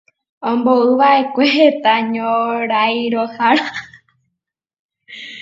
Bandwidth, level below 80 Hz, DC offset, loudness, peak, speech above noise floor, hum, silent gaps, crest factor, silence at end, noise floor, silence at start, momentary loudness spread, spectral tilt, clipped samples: 7.6 kHz; -68 dBFS; under 0.1%; -15 LUFS; 0 dBFS; 66 dB; none; 4.79-4.89 s; 16 dB; 0 s; -80 dBFS; 0.4 s; 14 LU; -5 dB/octave; under 0.1%